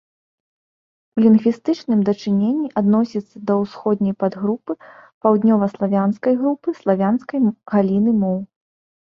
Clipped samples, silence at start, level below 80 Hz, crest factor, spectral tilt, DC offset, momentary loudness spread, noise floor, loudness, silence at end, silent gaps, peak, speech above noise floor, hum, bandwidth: under 0.1%; 1.15 s; -60 dBFS; 16 dB; -9 dB/octave; under 0.1%; 8 LU; under -90 dBFS; -19 LUFS; 0.7 s; 5.14-5.21 s; -2 dBFS; over 72 dB; none; 6.4 kHz